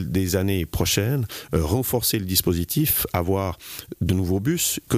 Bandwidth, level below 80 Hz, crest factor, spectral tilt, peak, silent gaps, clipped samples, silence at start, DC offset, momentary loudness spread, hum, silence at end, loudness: 15.5 kHz; -40 dBFS; 16 dB; -4.5 dB/octave; -6 dBFS; none; under 0.1%; 0 s; under 0.1%; 6 LU; none; 0 s; -23 LUFS